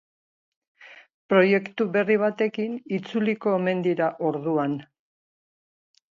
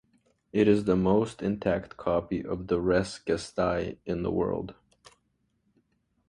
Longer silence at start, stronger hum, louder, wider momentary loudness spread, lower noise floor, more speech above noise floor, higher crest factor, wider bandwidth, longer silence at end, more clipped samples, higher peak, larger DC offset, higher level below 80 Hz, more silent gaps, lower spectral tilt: first, 0.8 s vs 0.55 s; neither; first, -24 LUFS vs -28 LUFS; about the same, 9 LU vs 9 LU; first, under -90 dBFS vs -74 dBFS; first, over 67 dB vs 47 dB; about the same, 20 dB vs 20 dB; second, 7.2 kHz vs 11 kHz; second, 1.3 s vs 1.6 s; neither; first, -6 dBFS vs -10 dBFS; neither; second, -74 dBFS vs -50 dBFS; first, 1.14-1.29 s vs none; about the same, -8 dB/octave vs -7 dB/octave